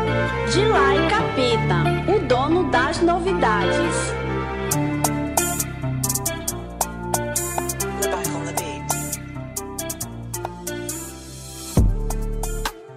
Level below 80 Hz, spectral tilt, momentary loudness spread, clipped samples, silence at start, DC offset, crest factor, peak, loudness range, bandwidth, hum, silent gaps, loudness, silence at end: -32 dBFS; -4.5 dB/octave; 11 LU; under 0.1%; 0 s; under 0.1%; 20 dB; -2 dBFS; 8 LU; 16 kHz; none; none; -22 LUFS; 0 s